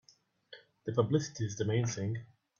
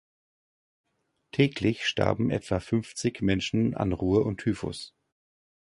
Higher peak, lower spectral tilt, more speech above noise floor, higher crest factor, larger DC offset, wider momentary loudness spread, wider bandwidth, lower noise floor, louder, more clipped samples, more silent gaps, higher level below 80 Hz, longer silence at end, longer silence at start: second, -14 dBFS vs -8 dBFS; about the same, -6 dB/octave vs -6 dB/octave; first, 33 dB vs 29 dB; about the same, 22 dB vs 20 dB; neither; first, 24 LU vs 9 LU; second, 7.4 kHz vs 11.5 kHz; first, -65 dBFS vs -55 dBFS; second, -34 LUFS vs -27 LUFS; neither; neither; second, -68 dBFS vs -50 dBFS; second, 0.35 s vs 0.9 s; second, 0.5 s vs 1.35 s